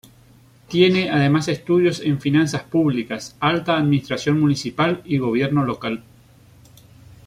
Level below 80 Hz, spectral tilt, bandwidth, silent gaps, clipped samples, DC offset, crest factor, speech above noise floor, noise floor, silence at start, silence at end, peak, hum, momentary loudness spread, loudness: -54 dBFS; -6 dB/octave; 14 kHz; none; under 0.1%; under 0.1%; 18 dB; 31 dB; -50 dBFS; 0.7 s; 1.25 s; -4 dBFS; none; 7 LU; -20 LUFS